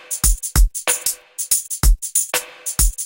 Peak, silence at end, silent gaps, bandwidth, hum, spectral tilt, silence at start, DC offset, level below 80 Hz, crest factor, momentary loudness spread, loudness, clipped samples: -2 dBFS; 0 s; none; 17.5 kHz; none; -2 dB/octave; 0.1 s; under 0.1%; -20 dBFS; 16 dB; 6 LU; -19 LUFS; under 0.1%